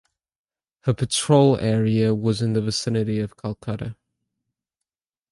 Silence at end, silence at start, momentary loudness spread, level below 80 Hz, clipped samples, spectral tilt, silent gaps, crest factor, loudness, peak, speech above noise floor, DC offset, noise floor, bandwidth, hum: 1.4 s; 0.85 s; 14 LU; -52 dBFS; under 0.1%; -6 dB/octave; none; 20 dB; -22 LUFS; -4 dBFS; 66 dB; under 0.1%; -87 dBFS; 11.5 kHz; none